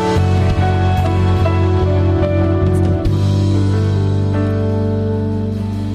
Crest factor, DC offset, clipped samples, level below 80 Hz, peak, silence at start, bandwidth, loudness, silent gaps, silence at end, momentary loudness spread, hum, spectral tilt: 8 dB; under 0.1%; under 0.1%; -28 dBFS; -6 dBFS; 0 s; 8.4 kHz; -15 LUFS; none; 0 s; 4 LU; 50 Hz at -40 dBFS; -8 dB/octave